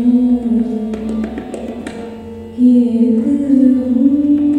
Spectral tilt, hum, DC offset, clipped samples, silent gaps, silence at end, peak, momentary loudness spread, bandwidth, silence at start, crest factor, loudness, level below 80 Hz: -8.5 dB/octave; none; under 0.1%; under 0.1%; none; 0 s; 0 dBFS; 16 LU; 9 kHz; 0 s; 12 dB; -13 LUFS; -42 dBFS